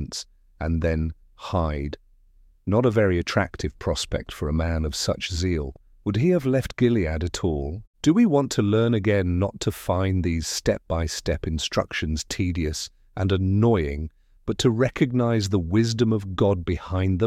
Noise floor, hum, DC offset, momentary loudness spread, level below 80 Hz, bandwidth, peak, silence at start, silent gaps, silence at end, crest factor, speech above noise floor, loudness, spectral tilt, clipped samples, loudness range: -55 dBFS; none; under 0.1%; 11 LU; -36 dBFS; 15.5 kHz; -8 dBFS; 0 s; 7.87-7.93 s; 0 s; 16 dB; 33 dB; -24 LUFS; -6 dB/octave; under 0.1%; 3 LU